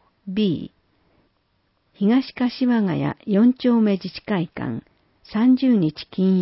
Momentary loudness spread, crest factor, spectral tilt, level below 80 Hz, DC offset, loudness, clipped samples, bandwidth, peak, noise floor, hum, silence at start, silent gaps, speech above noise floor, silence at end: 12 LU; 14 dB; -11.5 dB/octave; -58 dBFS; under 0.1%; -21 LUFS; under 0.1%; 5.8 kHz; -8 dBFS; -67 dBFS; none; 0.25 s; none; 48 dB; 0 s